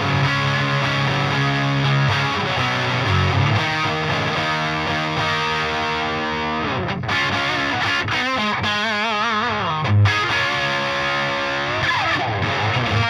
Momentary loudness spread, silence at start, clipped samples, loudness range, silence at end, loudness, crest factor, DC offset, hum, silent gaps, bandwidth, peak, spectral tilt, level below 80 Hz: 3 LU; 0 s; under 0.1%; 2 LU; 0 s; -19 LUFS; 14 dB; under 0.1%; none; none; 13.5 kHz; -6 dBFS; -5 dB/octave; -48 dBFS